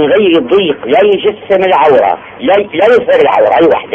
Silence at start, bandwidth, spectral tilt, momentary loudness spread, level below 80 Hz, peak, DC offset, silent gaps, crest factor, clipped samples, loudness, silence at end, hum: 0 s; 7 kHz; -6.5 dB/octave; 4 LU; -48 dBFS; 0 dBFS; under 0.1%; none; 8 dB; 0.3%; -9 LUFS; 0 s; none